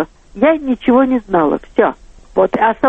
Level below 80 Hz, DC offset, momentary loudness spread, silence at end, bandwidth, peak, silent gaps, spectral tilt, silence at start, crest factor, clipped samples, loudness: -42 dBFS; under 0.1%; 5 LU; 0 s; 4.2 kHz; 0 dBFS; none; -8 dB/octave; 0 s; 14 dB; under 0.1%; -15 LUFS